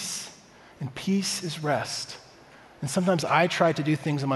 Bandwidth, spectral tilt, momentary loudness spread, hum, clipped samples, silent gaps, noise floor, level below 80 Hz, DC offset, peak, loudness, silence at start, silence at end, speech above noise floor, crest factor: 12 kHz; -4.5 dB/octave; 15 LU; none; under 0.1%; none; -51 dBFS; -66 dBFS; under 0.1%; -6 dBFS; -26 LUFS; 0 s; 0 s; 25 dB; 20 dB